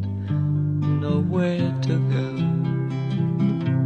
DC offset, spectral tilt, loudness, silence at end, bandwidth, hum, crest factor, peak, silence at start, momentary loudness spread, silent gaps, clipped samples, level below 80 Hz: under 0.1%; -9 dB/octave; -23 LUFS; 0 s; 7.8 kHz; none; 12 dB; -10 dBFS; 0 s; 3 LU; none; under 0.1%; -54 dBFS